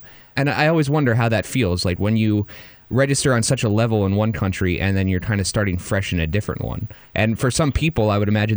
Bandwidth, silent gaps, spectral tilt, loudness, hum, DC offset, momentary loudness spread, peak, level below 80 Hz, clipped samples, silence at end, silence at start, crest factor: over 20 kHz; none; -5.5 dB/octave; -20 LUFS; none; under 0.1%; 7 LU; -4 dBFS; -38 dBFS; under 0.1%; 0 s; 0 s; 16 dB